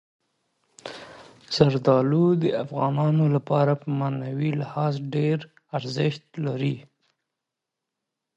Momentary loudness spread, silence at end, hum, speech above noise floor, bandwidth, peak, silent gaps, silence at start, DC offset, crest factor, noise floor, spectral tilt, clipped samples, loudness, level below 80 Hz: 13 LU; 1.55 s; none; 62 dB; 8 kHz; -2 dBFS; none; 0.85 s; under 0.1%; 22 dB; -85 dBFS; -8 dB/octave; under 0.1%; -24 LUFS; -64 dBFS